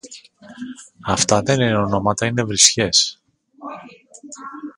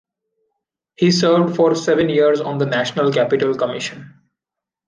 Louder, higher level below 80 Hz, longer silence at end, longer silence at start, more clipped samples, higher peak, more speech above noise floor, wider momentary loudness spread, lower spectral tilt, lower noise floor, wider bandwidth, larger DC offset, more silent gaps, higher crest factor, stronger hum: about the same, -16 LUFS vs -17 LUFS; first, -48 dBFS vs -60 dBFS; second, 0.05 s vs 0.8 s; second, 0.05 s vs 1 s; neither; first, 0 dBFS vs -4 dBFS; second, 24 dB vs 69 dB; first, 23 LU vs 7 LU; second, -3 dB/octave vs -5.5 dB/octave; second, -42 dBFS vs -86 dBFS; first, 16 kHz vs 9.8 kHz; neither; neither; first, 20 dB vs 14 dB; neither